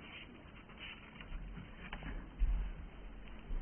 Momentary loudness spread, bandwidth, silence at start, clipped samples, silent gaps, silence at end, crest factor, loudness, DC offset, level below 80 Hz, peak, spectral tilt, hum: 13 LU; 3.3 kHz; 0 s; under 0.1%; none; 0 s; 18 dB; -48 LUFS; under 0.1%; -44 dBFS; -24 dBFS; -4.5 dB/octave; none